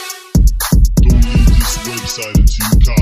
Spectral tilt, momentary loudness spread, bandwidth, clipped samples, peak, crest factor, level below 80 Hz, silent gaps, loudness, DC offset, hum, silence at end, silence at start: -5 dB/octave; 7 LU; 15.5 kHz; under 0.1%; 0 dBFS; 10 dB; -12 dBFS; none; -13 LUFS; under 0.1%; none; 0 s; 0 s